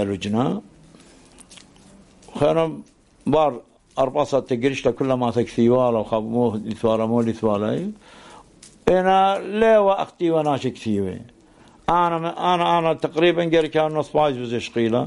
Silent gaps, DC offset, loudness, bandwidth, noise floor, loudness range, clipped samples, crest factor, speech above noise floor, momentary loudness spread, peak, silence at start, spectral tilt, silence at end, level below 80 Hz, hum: none; under 0.1%; -21 LUFS; 11.5 kHz; -51 dBFS; 4 LU; under 0.1%; 22 dB; 31 dB; 9 LU; 0 dBFS; 0 s; -6.5 dB/octave; 0 s; -52 dBFS; none